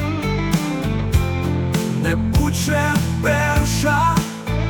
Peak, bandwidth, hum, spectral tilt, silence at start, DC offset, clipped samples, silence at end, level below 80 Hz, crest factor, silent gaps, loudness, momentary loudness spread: -6 dBFS; 19.5 kHz; none; -5.5 dB/octave; 0 s; under 0.1%; under 0.1%; 0 s; -28 dBFS; 12 dB; none; -19 LUFS; 4 LU